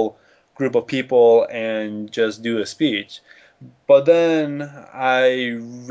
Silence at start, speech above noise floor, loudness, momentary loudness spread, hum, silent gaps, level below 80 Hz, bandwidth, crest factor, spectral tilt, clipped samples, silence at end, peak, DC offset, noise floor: 0 s; 21 dB; -18 LUFS; 14 LU; none; none; -68 dBFS; 8 kHz; 16 dB; -5.5 dB/octave; under 0.1%; 0 s; -2 dBFS; under 0.1%; -39 dBFS